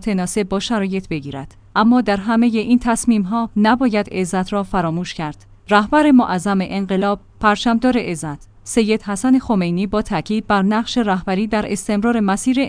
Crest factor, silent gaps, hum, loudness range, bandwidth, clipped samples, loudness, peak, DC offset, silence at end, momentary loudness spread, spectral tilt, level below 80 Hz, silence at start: 16 dB; none; none; 2 LU; 10.5 kHz; under 0.1%; -18 LUFS; -2 dBFS; under 0.1%; 0 s; 9 LU; -5.5 dB/octave; -40 dBFS; 0 s